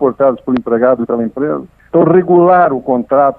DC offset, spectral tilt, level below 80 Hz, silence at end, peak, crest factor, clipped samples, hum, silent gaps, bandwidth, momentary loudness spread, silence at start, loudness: under 0.1%; -11 dB/octave; -50 dBFS; 0.05 s; 0 dBFS; 12 dB; under 0.1%; none; none; 4.2 kHz; 9 LU; 0 s; -12 LUFS